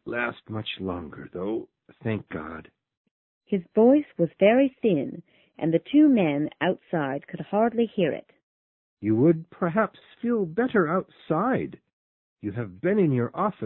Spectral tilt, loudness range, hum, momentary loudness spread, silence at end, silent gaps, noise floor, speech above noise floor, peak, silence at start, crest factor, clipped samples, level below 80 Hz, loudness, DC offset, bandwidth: -11.5 dB/octave; 5 LU; none; 15 LU; 0 s; 2.97-3.05 s, 3.11-3.41 s, 8.43-8.97 s, 11.93-12.36 s; under -90 dBFS; over 66 dB; -6 dBFS; 0.05 s; 20 dB; under 0.1%; -60 dBFS; -25 LUFS; under 0.1%; 4.1 kHz